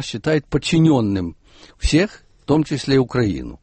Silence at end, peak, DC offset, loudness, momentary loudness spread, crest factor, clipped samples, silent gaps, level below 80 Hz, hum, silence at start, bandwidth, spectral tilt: 0.05 s; -4 dBFS; under 0.1%; -19 LUFS; 10 LU; 14 dB; under 0.1%; none; -32 dBFS; none; 0 s; 8.8 kHz; -6 dB/octave